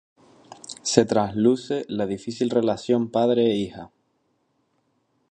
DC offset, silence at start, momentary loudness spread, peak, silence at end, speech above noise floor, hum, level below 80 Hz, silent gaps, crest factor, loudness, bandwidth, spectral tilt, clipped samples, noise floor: under 0.1%; 0.65 s; 12 LU; 0 dBFS; 1.45 s; 48 dB; none; -60 dBFS; none; 24 dB; -23 LUFS; 9.8 kHz; -5 dB/octave; under 0.1%; -70 dBFS